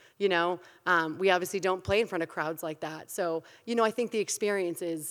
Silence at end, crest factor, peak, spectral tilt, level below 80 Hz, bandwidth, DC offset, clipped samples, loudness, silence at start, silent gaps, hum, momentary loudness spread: 0 s; 22 dB; -8 dBFS; -3.5 dB/octave; -64 dBFS; 19 kHz; under 0.1%; under 0.1%; -30 LUFS; 0.2 s; none; none; 9 LU